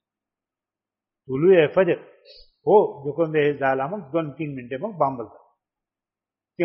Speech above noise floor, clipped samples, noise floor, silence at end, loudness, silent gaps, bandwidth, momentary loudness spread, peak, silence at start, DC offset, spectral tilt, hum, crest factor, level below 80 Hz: 69 dB; under 0.1%; -90 dBFS; 0 s; -22 LUFS; none; 5.6 kHz; 14 LU; -4 dBFS; 1.3 s; under 0.1%; -5.5 dB/octave; none; 20 dB; -66 dBFS